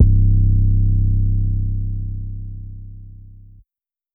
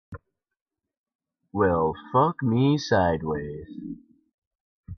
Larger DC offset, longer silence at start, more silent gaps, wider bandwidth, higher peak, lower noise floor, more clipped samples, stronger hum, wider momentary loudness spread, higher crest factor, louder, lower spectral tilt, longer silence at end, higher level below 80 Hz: neither; about the same, 0 s vs 0.1 s; second, none vs 0.61-0.66 s, 0.97-1.04 s, 1.15-1.19 s, 4.34-4.83 s; second, 0.5 kHz vs 6.6 kHz; first, -2 dBFS vs -8 dBFS; first, under -90 dBFS vs -47 dBFS; neither; neither; first, 20 LU vs 16 LU; second, 14 dB vs 20 dB; first, -19 LUFS vs -24 LUFS; first, -17.5 dB/octave vs -7 dB/octave; first, 0.8 s vs 0.05 s; first, -20 dBFS vs -52 dBFS